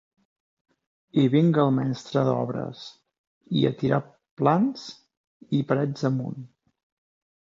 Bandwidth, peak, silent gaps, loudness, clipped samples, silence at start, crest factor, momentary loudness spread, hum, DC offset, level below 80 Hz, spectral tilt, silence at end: 7.6 kHz; -6 dBFS; 3.18-3.41 s, 4.31-4.37 s, 5.17-5.40 s; -24 LUFS; under 0.1%; 1.15 s; 20 dB; 16 LU; none; under 0.1%; -66 dBFS; -8 dB/octave; 0.95 s